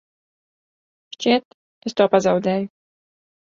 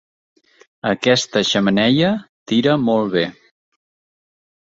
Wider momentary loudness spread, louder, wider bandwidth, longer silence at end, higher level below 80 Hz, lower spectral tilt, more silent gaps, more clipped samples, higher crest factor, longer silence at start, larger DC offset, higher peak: first, 13 LU vs 8 LU; second, -20 LUFS vs -17 LUFS; about the same, 7.6 kHz vs 7.8 kHz; second, 0.9 s vs 1.4 s; second, -66 dBFS vs -56 dBFS; about the same, -5.5 dB/octave vs -5 dB/octave; first, 1.45-1.81 s vs 2.29-2.46 s; neither; about the same, 22 dB vs 18 dB; first, 1.2 s vs 0.85 s; neither; about the same, -2 dBFS vs -2 dBFS